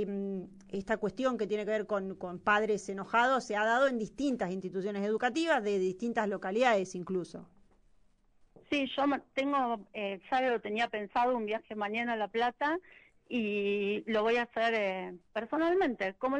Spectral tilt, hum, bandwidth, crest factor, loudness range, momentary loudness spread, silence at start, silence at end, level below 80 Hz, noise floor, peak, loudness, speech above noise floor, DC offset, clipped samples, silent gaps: -5 dB/octave; none; 10 kHz; 18 dB; 3 LU; 9 LU; 0 s; 0 s; -68 dBFS; -65 dBFS; -14 dBFS; -32 LUFS; 34 dB; under 0.1%; under 0.1%; none